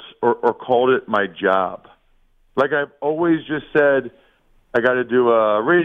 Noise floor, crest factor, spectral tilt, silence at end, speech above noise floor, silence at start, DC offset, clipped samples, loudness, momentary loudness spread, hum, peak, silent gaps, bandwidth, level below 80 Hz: -57 dBFS; 16 dB; -8 dB/octave; 0 s; 39 dB; 0 s; under 0.1%; under 0.1%; -19 LUFS; 8 LU; none; -2 dBFS; none; 5.4 kHz; -58 dBFS